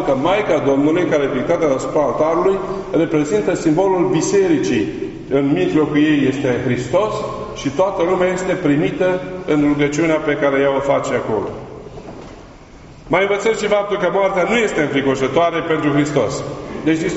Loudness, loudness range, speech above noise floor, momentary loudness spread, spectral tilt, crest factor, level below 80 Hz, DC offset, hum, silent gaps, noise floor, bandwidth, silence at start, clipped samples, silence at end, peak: -17 LUFS; 3 LU; 23 dB; 8 LU; -5 dB/octave; 16 dB; -44 dBFS; under 0.1%; none; none; -39 dBFS; 8 kHz; 0 s; under 0.1%; 0 s; -2 dBFS